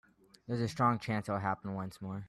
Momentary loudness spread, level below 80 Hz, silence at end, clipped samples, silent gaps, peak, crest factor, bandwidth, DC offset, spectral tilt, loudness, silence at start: 10 LU; -68 dBFS; 0 s; under 0.1%; none; -16 dBFS; 18 dB; 13.5 kHz; under 0.1%; -7 dB/octave; -35 LUFS; 0.5 s